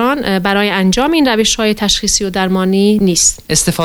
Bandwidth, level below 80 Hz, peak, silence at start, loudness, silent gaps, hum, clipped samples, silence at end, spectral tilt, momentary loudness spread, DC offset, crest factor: over 20 kHz; -34 dBFS; 0 dBFS; 0 s; -12 LUFS; none; none; under 0.1%; 0 s; -3.5 dB/octave; 3 LU; under 0.1%; 12 dB